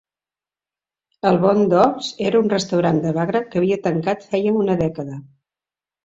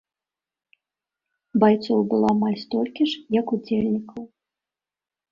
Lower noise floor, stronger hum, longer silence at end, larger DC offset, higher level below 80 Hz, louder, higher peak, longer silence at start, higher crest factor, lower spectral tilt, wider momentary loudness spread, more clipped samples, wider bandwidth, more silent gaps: about the same, under -90 dBFS vs under -90 dBFS; second, none vs 50 Hz at -50 dBFS; second, 0.8 s vs 1.05 s; neither; first, -56 dBFS vs -62 dBFS; first, -19 LUFS vs -22 LUFS; about the same, -2 dBFS vs -4 dBFS; second, 1.25 s vs 1.55 s; about the same, 18 dB vs 20 dB; about the same, -6.5 dB/octave vs -7.5 dB/octave; about the same, 8 LU vs 9 LU; neither; first, 8 kHz vs 7 kHz; neither